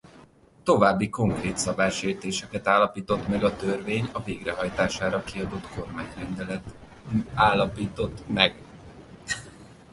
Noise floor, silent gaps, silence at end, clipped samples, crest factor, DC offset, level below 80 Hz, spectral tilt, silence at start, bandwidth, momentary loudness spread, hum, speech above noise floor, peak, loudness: -54 dBFS; none; 0.2 s; under 0.1%; 26 dB; under 0.1%; -48 dBFS; -4.5 dB/octave; 0.15 s; 11.5 kHz; 14 LU; none; 28 dB; -2 dBFS; -26 LUFS